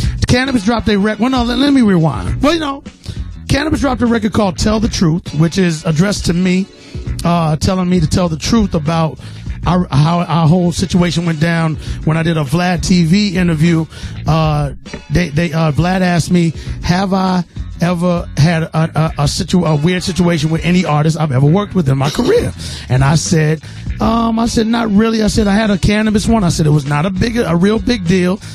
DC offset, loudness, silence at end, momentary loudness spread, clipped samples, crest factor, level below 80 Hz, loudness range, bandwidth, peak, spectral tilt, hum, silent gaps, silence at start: under 0.1%; -14 LUFS; 0 s; 6 LU; under 0.1%; 12 dB; -28 dBFS; 2 LU; 13.5 kHz; 0 dBFS; -6 dB/octave; none; none; 0 s